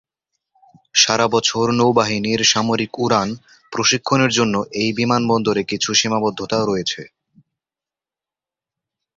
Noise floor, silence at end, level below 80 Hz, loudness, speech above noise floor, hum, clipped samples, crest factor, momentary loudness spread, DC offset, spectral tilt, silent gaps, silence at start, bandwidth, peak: -89 dBFS; 2.1 s; -56 dBFS; -17 LUFS; 72 dB; none; under 0.1%; 18 dB; 6 LU; under 0.1%; -3.5 dB/octave; none; 0.95 s; 7.8 kHz; -2 dBFS